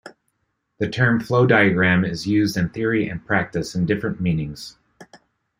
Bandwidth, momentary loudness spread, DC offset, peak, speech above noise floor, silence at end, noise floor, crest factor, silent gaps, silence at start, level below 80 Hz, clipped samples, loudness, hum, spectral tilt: 15.5 kHz; 11 LU; under 0.1%; -2 dBFS; 53 dB; 0.45 s; -73 dBFS; 20 dB; none; 0.05 s; -50 dBFS; under 0.1%; -20 LUFS; none; -6.5 dB/octave